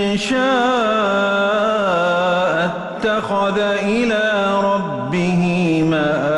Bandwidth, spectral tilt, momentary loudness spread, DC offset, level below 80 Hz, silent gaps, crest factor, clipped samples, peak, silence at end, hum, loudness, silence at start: 11.5 kHz; -5.5 dB/octave; 4 LU; under 0.1%; -50 dBFS; none; 10 dB; under 0.1%; -6 dBFS; 0 s; none; -17 LUFS; 0 s